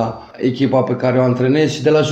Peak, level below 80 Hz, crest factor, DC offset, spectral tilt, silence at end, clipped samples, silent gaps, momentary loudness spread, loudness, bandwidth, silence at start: -2 dBFS; -52 dBFS; 12 dB; under 0.1%; -6.5 dB/octave; 0 s; under 0.1%; none; 6 LU; -16 LUFS; 8.4 kHz; 0 s